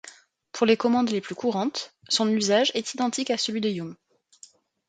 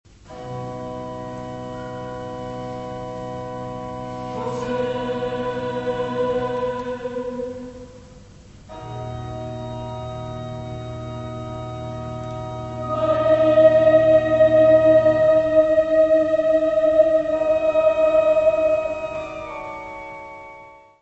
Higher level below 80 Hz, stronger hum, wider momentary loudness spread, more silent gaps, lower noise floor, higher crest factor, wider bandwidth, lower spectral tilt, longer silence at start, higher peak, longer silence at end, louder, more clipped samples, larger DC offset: second, -72 dBFS vs -46 dBFS; neither; second, 10 LU vs 17 LU; neither; first, -54 dBFS vs -44 dBFS; about the same, 20 dB vs 18 dB; first, 9.4 kHz vs 8 kHz; second, -3.5 dB/octave vs -7 dB/octave; second, 0.05 s vs 0.25 s; second, -6 dBFS vs -2 dBFS; first, 0.95 s vs 0.25 s; second, -25 LUFS vs -20 LUFS; neither; neither